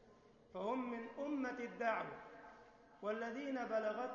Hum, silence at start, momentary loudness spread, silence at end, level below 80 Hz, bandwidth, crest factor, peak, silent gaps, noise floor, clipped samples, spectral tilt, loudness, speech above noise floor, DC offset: none; 0 s; 16 LU; 0 s; -78 dBFS; 7 kHz; 18 dB; -26 dBFS; none; -66 dBFS; under 0.1%; -3.5 dB/octave; -43 LUFS; 24 dB; under 0.1%